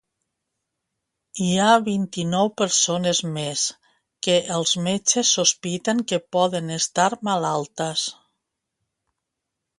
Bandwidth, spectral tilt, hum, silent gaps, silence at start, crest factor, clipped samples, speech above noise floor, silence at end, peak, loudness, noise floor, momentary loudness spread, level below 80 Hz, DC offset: 11.5 kHz; -3 dB/octave; none; none; 1.35 s; 20 dB; under 0.1%; 60 dB; 1.65 s; -2 dBFS; -21 LUFS; -82 dBFS; 8 LU; -66 dBFS; under 0.1%